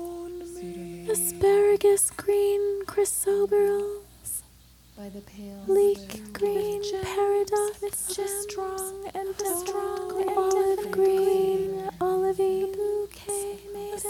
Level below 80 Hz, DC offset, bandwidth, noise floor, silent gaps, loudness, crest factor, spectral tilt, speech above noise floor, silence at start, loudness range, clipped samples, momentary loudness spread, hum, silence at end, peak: -56 dBFS; under 0.1%; 18 kHz; -54 dBFS; none; -26 LUFS; 14 dB; -3.5 dB/octave; 29 dB; 0 s; 5 LU; under 0.1%; 16 LU; 60 Hz at -55 dBFS; 0 s; -12 dBFS